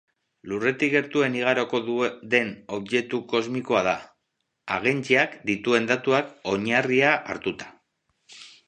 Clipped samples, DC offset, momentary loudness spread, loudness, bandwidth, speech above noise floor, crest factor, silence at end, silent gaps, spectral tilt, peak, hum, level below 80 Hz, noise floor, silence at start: under 0.1%; under 0.1%; 10 LU; -24 LUFS; 9.8 kHz; 54 dB; 22 dB; 0.2 s; none; -5 dB/octave; -4 dBFS; none; -66 dBFS; -78 dBFS; 0.45 s